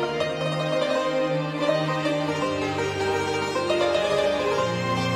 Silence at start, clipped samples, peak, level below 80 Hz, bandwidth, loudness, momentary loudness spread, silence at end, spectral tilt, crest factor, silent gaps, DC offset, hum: 0 s; under 0.1%; -10 dBFS; -54 dBFS; 14.5 kHz; -24 LUFS; 3 LU; 0 s; -5 dB/octave; 14 dB; none; under 0.1%; none